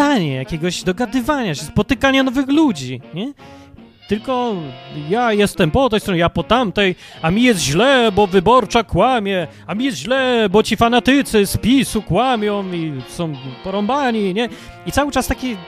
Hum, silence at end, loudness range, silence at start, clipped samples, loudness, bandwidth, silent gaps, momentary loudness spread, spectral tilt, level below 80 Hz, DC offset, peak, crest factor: none; 0 s; 5 LU; 0 s; under 0.1%; -17 LUFS; 15.5 kHz; none; 12 LU; -5 dB/octave; -38 dBFS; under 0.1%; 0 dBFS; 16 dB